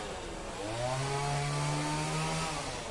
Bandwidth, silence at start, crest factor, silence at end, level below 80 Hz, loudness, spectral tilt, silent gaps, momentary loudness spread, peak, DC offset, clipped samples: 11.5 kHz; 0 s; 14 dB; 0 s; -50 dBFS; -34 LUFS; -4.5 dB/octave; none; 7 LU; -20 dBFS; under 0.1%; under 0.1%